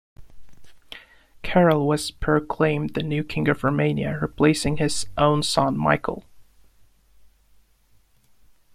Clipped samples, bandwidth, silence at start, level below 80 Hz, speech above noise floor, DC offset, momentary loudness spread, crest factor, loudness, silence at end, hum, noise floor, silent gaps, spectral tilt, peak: under 0.1%; 15 kHz; 0.2 s; -46 dBFS; 37 dB; under 0.1%; 15 LU; 20 dB; -22 LUFS; 2.35 s; none; -59 dBFS; none; -5.5 dB/octave; -4 dBFS